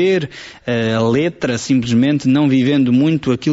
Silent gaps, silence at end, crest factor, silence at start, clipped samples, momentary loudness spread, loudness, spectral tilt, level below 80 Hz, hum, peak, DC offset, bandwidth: none; 0 s; 10 dB; 0 s; under 0.1%; 7 LU; -15 LUFS; -6 dB/octave; -50 dBFS; none; -4 dBFS; under 0.1%; 8 kHz